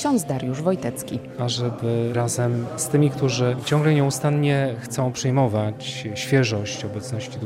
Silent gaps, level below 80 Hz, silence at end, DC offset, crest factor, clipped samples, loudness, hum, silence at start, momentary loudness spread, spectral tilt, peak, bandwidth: none; -58 dBFS; 0 s; under 0.1%; 18 dB; under 0.1%; -23 LUFS; none; 0 s; 9 LU; -5.5 dB/octave; -6 dBFS; 16 kHz